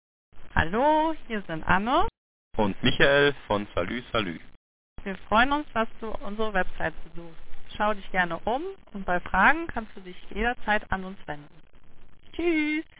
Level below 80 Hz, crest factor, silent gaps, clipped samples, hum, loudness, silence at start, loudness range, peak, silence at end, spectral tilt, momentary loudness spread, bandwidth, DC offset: -42 dBFS; 22 dB; 2.17-2.51 s, 4.57-4.96 s; under 0.1%; none; -26 LUFS; 0.35 s; 5 LU; -4 dBFS; 0.1 s; -9 dB/octave; 18 LU; 4 kHz; 0.2%